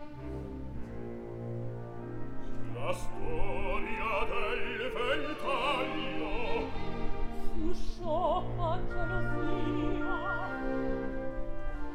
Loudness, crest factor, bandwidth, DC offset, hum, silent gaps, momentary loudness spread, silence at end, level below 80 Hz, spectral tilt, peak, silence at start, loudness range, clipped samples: -35 LUFS; 14 dB; 9.8 kHz; under 0.1%; none; none; 10 LU; 0 s; -38 dBFS; -6.5 dB/octave; -16 dBFS; 0 s; 5 LU; under 0.1%